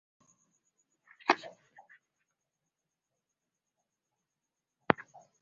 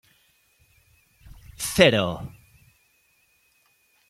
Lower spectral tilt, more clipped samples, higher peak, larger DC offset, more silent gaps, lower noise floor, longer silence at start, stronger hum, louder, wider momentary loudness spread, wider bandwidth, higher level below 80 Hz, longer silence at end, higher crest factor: second, -2.5 dB/octave vs -4 dB/octave; neither; about the same, -2 dBFS vs -2 dBFS; neither; neither; first, -88 dBFS vs -65 dBFS; second, 1.3 s vs 1.6 s; neither; second, -32 LUFS vs -21 LUFS; about the same, 20 LU vs 20 LU; second, 7.2 kHz vs 16 kHz; second, -76 dBFS vs -52 dBFS; second, 0.5 s vs 1.8 s; first, 38 dB vs 26 dB